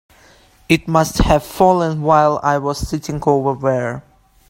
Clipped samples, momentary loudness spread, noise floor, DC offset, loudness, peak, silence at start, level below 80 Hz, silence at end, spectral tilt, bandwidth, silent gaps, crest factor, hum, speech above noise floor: under 0.1%; 9 LU; -49 dBFS; under 0.1%; -16 LUFS; 0 dBFS; 0.7 s; -32 dBFS; 0.5 s; -6 dB/octave; 16.5 kHz; none; 16 dB; none; 33 dB